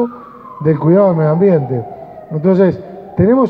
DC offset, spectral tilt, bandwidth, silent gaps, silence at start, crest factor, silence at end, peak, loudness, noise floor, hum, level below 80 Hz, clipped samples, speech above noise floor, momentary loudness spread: under 0.1%; -12 dB/octave; 5 kHz; none; 0 s; 12 dB; 0 s; 0 dBFS; -13 LUFS; -33 dBFS; none; -48 dBFS; under 0.1%; 22 dB; 19 LU